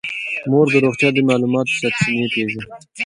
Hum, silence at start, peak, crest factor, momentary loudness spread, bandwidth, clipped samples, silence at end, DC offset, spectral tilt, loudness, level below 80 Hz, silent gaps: none; 0.05 s; 0 dBFS; 18 dB; 9 LU; 11.5 kHz; under 0.1%; 0 s; under 0.1%; -5.5 dB/octave; -17 LUFS; -58 dBFS; none